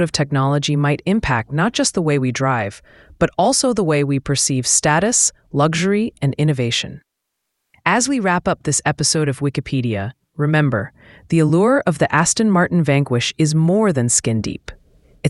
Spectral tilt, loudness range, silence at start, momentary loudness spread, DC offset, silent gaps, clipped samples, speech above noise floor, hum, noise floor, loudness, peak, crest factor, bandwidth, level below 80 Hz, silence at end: -4.5 dB/octave; 3 LU; 0 s; 7 LU; under 0.1%; none; under 0.1%; 59 dB; none; -77 dBFS; -17 LUFS; 0 dBFS; 18 dB; 12 kHz; -46 dBFS; 0 s